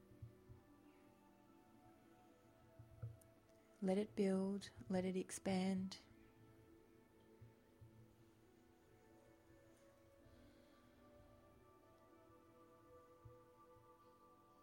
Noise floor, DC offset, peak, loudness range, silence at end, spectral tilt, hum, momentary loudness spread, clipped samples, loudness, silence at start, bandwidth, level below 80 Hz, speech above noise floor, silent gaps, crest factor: -71 dBFS; under 0.1%; -30 dBFS; 24 LU; 0.7 s; -6.5 dB/octave; none; 27 LU; under 0.1%; -44 LUFS; 0.1 s; 16.5 kHz; -78 dBFS; 28 dB; none; 22 dB